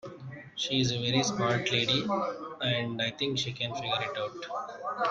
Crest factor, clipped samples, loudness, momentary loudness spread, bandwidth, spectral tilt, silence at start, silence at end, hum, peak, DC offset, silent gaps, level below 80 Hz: 18 dB; under 0.1%; -30 LUFS; 10 LU; 9.2 kHz; -4 dB/octave; 0.05 s; 0 s; none; -12 dBFS; under 0.1%; none; -64 dBFS